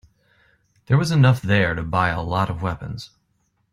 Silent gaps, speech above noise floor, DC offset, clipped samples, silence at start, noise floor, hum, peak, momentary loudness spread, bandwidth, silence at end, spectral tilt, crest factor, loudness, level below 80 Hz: none; 48 dB; under 0.1%; under 0.1%; 0.9 s; -68 dBFS; none; -4 dBFS; 16 LU; 12.5 kHz; 0.65 s; -6.5 dB/octave; 18 dB; -20 LUFS; -46 dBFS